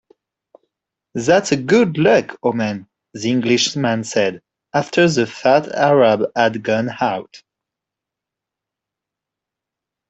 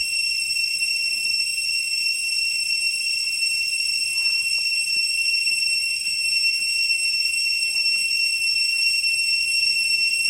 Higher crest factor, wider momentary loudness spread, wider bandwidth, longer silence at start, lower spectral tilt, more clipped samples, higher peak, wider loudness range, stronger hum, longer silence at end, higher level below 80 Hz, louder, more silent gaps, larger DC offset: first, 18 dB vs 12 dB; first, 9 LU vs 3 LU; second, 8.4 kHz vs 16.5 kHz; first, 1.15 s vs 0 s; first, -5 dB/octave vs 4 dB/octave; neither; first, -2 dBFS vs -10 dBFS; first, 7 LU vs 2 LU; neither; first, 2.7 s vs 0 s; about the same, -60 dBFS vs -62 dBFS; about the same, -17 LUFS vs -19 LUFS; neither; neither